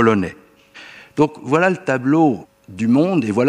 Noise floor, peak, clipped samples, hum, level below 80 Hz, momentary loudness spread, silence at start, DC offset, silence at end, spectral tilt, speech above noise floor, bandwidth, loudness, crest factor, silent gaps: -43 dBFS; -2 dBFS; under 0.1%; none; -58 dBFS; 16 LU; 0 s; under 0.1%; 0 s; -7.5 dB/octave; 26 dB; 11 kHz; -18 LUFS; 16 dB; none